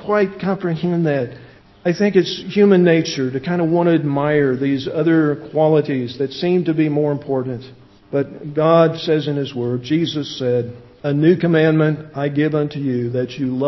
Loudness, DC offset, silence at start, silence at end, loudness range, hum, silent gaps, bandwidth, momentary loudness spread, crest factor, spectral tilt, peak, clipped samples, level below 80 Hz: -18 LUFS; under 0.1%; 0 s; 0 s; 3 LU; none; none; 6.2 kHz; 9 LU; 18 dB; -7.5 dB/octave; 0 dBFS; under 0.1%; -56 dBFS